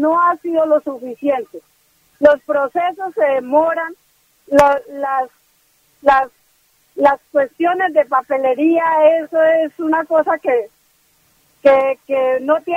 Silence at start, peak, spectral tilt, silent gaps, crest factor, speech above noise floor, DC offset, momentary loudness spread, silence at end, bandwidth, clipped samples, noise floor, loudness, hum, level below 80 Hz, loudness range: 0 s; 0 dBFS; -5.5 dB/octave; none; 16 dB; 43 dB; under 0.1%; 8 LU; 0 s; 16 kHz; under 0.1%; -58 dBFS; -16 LUFS; none; -54 dBFS; 3 LU